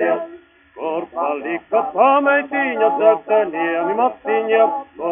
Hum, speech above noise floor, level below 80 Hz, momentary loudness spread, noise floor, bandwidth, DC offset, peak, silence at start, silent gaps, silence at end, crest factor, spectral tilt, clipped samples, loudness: none; 26 dB; -66 dBFS; 10 LU; -42 dBFS; 3.7 kHz; under 0.1%; -2 dBFS; 0 s; none; 0 s; 16 dB; -2.5 dB/octave; under 0.1%; -18 LUFS